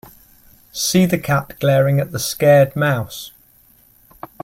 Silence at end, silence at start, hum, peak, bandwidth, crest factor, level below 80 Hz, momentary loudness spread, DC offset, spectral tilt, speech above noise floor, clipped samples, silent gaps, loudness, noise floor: 1.15 s; 0.75 s; none; -2 dBFS; 16.5 kHz; 18 dB; -52 dBFS; 17 LU; under 0.1%; -5 dB/octave; 36 dB; under 0.1%; none; -16 LUFS; -52 dBFS